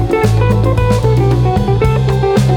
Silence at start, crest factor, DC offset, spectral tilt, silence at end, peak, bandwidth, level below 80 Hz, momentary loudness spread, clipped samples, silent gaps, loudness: 0 s; 10 dB; under 0.1%; -7.5 dB/octave; 0 s; 0 dBFS; 13.5 kHz; -22 dBFS; 1 LU; under 0.1%; none; -12 LUFS